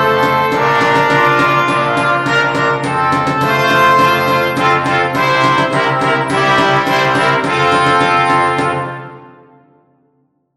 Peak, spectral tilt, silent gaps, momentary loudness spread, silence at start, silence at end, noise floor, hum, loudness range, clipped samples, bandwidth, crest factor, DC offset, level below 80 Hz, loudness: 0 dBFS; -5 dB/octave; none; 4 LU; 0 s; 1.3 s; -60 dBFS; none; 2 LU; under 0.1%; 15 kHz; 12 dB; under 0.1%; -48 dBFS; -12 LUFS